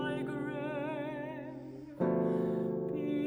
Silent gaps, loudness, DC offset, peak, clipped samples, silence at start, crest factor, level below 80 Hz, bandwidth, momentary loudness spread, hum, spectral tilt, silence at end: none; -35 LUFS; under 0.1%; -18 dBFS; under 0.1%; 0 s; 16 dB; -68 dBFS; over 20 kHz; 12 LU; none; -8.5 dB/octave; 0 s